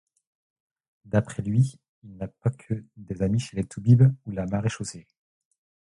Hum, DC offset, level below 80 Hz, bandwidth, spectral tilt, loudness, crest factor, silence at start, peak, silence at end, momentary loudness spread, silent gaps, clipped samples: none; under 0.1%; -52 dBFS; 11 kHz; -7.5 dB/octave; -25 LUFS; 20 dB; 1.15 s; -6 dBFS; 0.9 s; 18 LU; 1.89-2.02 s; under 0.1%